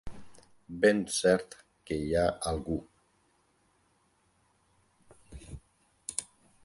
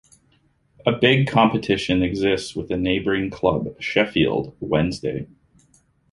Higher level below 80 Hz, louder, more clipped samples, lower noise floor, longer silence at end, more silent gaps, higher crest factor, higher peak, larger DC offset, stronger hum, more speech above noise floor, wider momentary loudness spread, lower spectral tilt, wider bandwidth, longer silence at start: second, -52 dBFS vs -44 dBFS; second, -30 LUFS vs -21 LUFS; neither; first, -71 dBFS vs -62 dBFS; second, 0.4 s vs 0.85 s; neither; about the same, 24 dB vs 20 dB; second, -10 dBFS vs -2 dBFS; neither; neither; about the same, 42 dB vs 41 dB; first, 25 LU vs 10 LU; second, -4.5 dB/octave vs -6 dB/octave; about the same, 11.5 kHz vs 11.5 kHz; second, 0.05 s vs 0.85 s